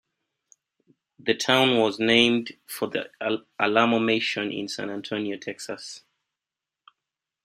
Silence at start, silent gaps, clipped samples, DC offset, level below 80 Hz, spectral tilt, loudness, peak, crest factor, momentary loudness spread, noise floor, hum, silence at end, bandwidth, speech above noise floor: 1.25 s; none; under 0.1%; under 0.1%; -68 dBFS; -4 dB/octave; -24 LUFS; -4 dBFS; 22 dB; 16 LU; -89 dBFS; none; 1.45 s; 15.5 kHz; 64 dB